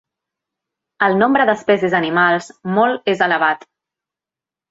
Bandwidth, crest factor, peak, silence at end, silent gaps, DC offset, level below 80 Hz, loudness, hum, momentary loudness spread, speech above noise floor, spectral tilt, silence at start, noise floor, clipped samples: 8 kHz; 16 dB; -2 dBFS; 1.15 s; none; under 0.1%; -62 dBFS; -16 LUFS; none; 6 LU; 73 dB; -6 dB/octave; 1 s; -89 dBFS; under 0.1%